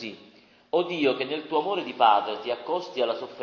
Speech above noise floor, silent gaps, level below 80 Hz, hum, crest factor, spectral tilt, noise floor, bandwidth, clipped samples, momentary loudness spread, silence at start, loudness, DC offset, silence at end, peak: 30 dB; none; -76 dBFS; none; 20 dB; -5.5 dB/octave; -55 dBFS; 7 kHz; under 0.1%; 9 LU; 0 s; -26 LUFS; under 0.1%; 0 s; -6 dBFS